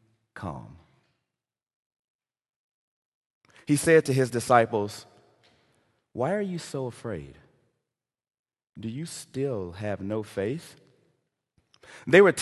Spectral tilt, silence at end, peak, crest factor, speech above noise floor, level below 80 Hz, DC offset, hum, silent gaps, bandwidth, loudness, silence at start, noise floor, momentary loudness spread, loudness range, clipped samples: -5.5 dB/octave; 0 s; -4 dBFS; 26 dB; over 65 dB; -60 dBFS; under 0.1%; none; 1.73-1.91 s, 1.99-2.19 s, 2.56-3.41 s, 8.39-8.44 s, 8.69-8.73 s; 12.5 kHz; -26 LUFS; 0.35 s; under -90 dBFS; 19 LU; 11 LU; under 0.1%